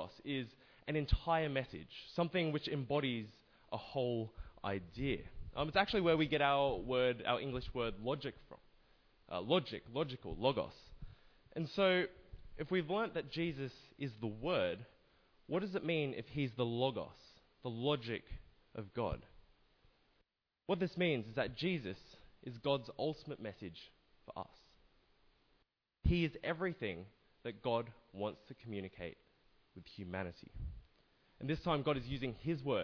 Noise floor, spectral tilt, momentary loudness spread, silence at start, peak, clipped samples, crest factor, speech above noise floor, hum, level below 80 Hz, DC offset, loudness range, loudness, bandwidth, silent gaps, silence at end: -81 dBFS; -4.5 dB/octave; 16 LU; 0 s; -18 dBFS; under 0.1%; 22 dB; 42 dB; none; -54 dBFS; under 0.1%; 9 LU; -39 LUFS; 5.4 kHz; none; 0 s